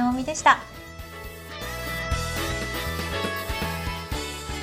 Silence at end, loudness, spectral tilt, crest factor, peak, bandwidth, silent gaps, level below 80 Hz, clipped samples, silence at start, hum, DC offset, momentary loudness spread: 0 s; -26 LUFS; -4 dB/octave; 24 dB; -4 dBFS; 16 kHz; none; -38 dBFS; under 0.1%; 0 s; none; under 0.1%; 18 LU